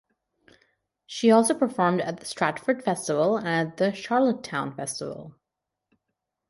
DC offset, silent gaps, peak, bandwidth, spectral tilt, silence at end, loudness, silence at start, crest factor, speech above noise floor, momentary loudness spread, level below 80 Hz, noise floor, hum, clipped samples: under 0.1%; none; -6 dBFS; 11.5 kHz; -5 dB/octave; 1.2 s; -25 LUFS; 1.1 s; 20 dB; 61 dB; 12 LU; -70 dBFS; -85 dBFS; none; under 0.1%